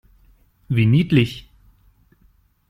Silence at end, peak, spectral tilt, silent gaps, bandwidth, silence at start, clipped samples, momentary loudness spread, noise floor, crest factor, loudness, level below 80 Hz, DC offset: 1.3 s; -2 dBFS; -8 dB/octave; none; 11 kHz; 0.7 s; under 0.1%; 10 LU; -58 dBFS; 20 dB; -18 LUFS; -48 dBFS; under 0.1%